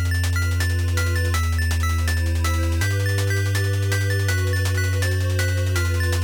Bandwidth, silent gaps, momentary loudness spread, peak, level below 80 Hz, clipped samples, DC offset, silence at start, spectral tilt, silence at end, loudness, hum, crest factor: over 20 kHz; none; 1 LU; -10 dBFS; -30 dBFS; under 0.1%; under 0.1%; 0 s; -4.5 dB/octave; 0 s; -22 LUFS; none; 10 dB